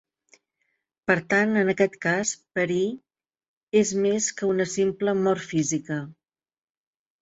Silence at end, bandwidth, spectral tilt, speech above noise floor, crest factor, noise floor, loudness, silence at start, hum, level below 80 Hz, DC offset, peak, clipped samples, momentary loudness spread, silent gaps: 1.1 s; 8.2 kHz; -4.5 dB/octave; over 66 dB; 20 dB; under -90 dBFS; -24 LUFS; 1.1 s; none; -66 dBFS; under 0.1%; -6 dBFS; under 0.1%; 8 LU; 3.48-3.67 s